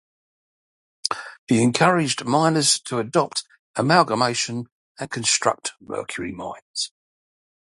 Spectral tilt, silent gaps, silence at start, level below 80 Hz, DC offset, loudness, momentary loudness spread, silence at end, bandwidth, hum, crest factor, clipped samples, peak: -3.5 dB/octave; 1.39-1.47 s, 3.59-3.74 s, 4.72-4.95 s, 6.62-6.74 s; 1.05 s; -62 dBFS; under 0.1%; -21 LUFS; 14 LU; 0.8 s; 11.5 kHz; none; 22 dB; under 0.1%; 0 dBFS